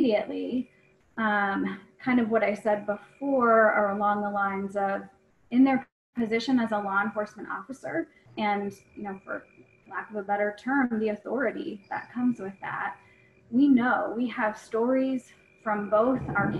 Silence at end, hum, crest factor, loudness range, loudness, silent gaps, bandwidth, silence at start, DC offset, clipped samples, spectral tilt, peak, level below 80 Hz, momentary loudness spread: 0 s; none; 18 dB; 6 LU; -27 LUFS; 5.92-6.13 s; 10.5 kHz; 0 s; under 0.1%; under 0.1%; -7 dB/octave; -10 dBFS; -64 dBFS; 14 LU